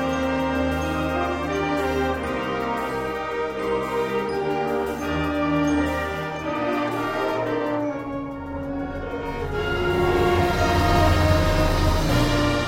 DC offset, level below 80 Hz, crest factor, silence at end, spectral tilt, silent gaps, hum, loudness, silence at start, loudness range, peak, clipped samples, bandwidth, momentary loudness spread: under 0.1%; -32 dBFS; 18 dB; 0 s; -6 dB/octave; none; none; -23 LUFS; 0 s; 5 LU; -6 dBFS; under 0.1%; 16.5 kHz; 9 LU